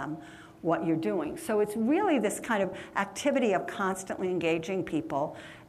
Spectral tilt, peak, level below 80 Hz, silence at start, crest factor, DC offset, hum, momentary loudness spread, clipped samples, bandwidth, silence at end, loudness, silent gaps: -5 dB/octave; -14 dBFS; -64 dBFS; 0 s; 16 dB; under 0.1%; none; 7 LU; under 0.1%; 15 kHz; 0 s; -30 LUFS; none